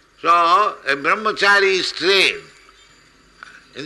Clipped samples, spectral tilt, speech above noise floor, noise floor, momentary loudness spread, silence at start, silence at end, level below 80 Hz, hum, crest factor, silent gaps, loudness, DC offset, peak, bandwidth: under 0.1%; -2 dB/octave; 35 dB; -51 dBFS; 6 LU; 0.25 s; 0 s; -60 dBFS; none; 14 dB; none; -15 LUFS; under 0.1%; -4 dBFS; 12 kHz